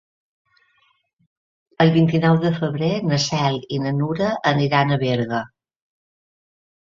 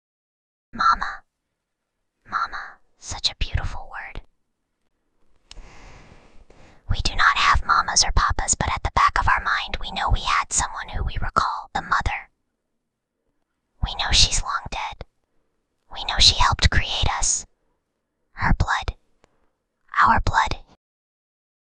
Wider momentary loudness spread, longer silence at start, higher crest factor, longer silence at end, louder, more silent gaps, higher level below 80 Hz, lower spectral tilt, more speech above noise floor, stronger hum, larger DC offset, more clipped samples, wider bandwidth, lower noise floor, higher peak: second, 7 LU vs 17 LU; first, 1.8 s vs 0.75 s; about the same, 20 dB vs 22 dB; first, 1.4 s vs 1.05 s; about the same, -20 LUFS vs -21 LUFS; neither; second, -56 dBFS vs -30 dBFS; first, -6 dB/octave vs -1.5 dB/octave; second, 45 dB vs 58 dB; neither; neither; neither; second, 7.4 kHz vs 10 kHz; second, -64 dBFS vs -79 dBFS; about the same, -2 dBFS vs -2 dBFS